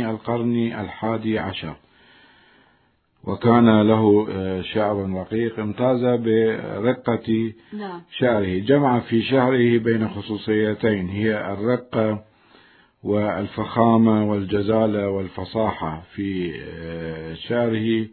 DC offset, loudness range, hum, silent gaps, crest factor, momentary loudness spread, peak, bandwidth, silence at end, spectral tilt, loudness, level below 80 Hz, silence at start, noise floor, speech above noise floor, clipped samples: under 0.1%; 5 LU; none; none; 20 dB; 14 LU; -2 dBFS; 4.5 kHz; 0.05 s; -11.5 dB/octave; -21 LUFS; -56 dBFS; 0 s; -62 dBFS; 42 dB; under 0.1%